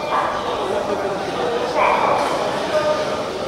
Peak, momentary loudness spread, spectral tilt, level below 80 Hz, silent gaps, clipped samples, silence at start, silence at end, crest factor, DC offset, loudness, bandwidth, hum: -4 dBFS; 6 LU; -4 dB/octave; -50 dBFS; none; under 0.1%; 0 s; 0 s; 16 dB; under 0.1%; -20 LUFS; 15 kHz; none